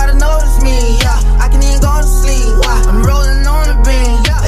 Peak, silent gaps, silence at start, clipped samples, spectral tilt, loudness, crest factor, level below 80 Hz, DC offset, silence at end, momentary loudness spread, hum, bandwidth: 0 dBFS; none; 0 s; under 0.1%; -4.5 dB/octave; -12 LUFS; 8 dB; -8 dBFS; under 0.1%; 0 s; 1 LU; none; 14.5 kHz